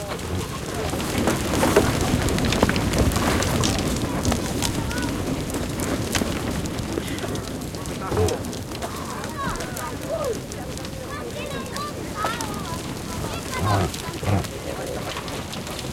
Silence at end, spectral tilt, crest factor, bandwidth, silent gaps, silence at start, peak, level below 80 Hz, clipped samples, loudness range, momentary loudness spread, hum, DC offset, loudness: 0 s; -4.5 dB/octave; 24 dB; 17 kHz; none; 0 s; -2 dBFS; -36 dBFS; under 0.1%; 8 LU; 9 LU; none; under 0.1%; -25 LUFS